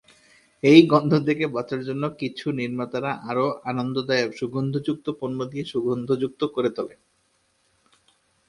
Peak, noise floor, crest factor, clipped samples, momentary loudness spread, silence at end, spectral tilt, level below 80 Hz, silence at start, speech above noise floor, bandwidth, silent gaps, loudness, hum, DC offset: 0 dBFS; -67 dBFS; 24 dB; under 0.1%; 13 LU; 1.6 s; -7 dB/octave; -64 dBFS; 0.65 s; 44 dB; 11 kHz; none; -23 LUFS; none; under 0.1%